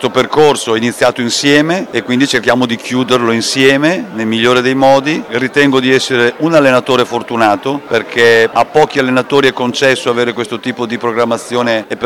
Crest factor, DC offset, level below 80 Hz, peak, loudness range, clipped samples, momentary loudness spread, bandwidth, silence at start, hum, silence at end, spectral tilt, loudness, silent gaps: 12 dB; 0.2%; -52 dBFS; 0 dBFS; 1 LU; under 0.1%; 7 LU; 17.5 kHz; 0 s; none; 0 s; -4 dB/octave; -11 LUFS; none